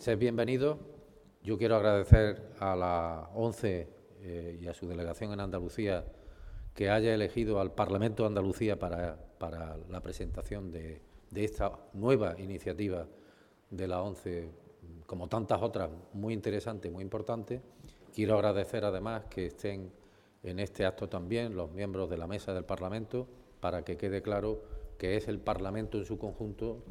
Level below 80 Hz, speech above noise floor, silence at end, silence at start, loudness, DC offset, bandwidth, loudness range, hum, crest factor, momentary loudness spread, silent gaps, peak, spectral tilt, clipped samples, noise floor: -44 dBFS; 28 dB; 0 s; 0 s; -34 LUFS; under 0.1%; 14 kHz; 7 LU; none; 28 dB; 15 LU; none; -4 dBFS; -7.5 dB/octave; under 0.1%; -62 dBFS